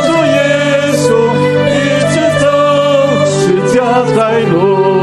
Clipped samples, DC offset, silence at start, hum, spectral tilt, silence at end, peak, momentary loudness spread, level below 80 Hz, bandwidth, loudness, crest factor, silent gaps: under 0.1%; under 0.1%; 0 s; none; -5.5 dB/octave; 0 s; 0 dBFS; 1 LU; -44 dBFS; 13 kHz; -10 LUFS; 10 dB; none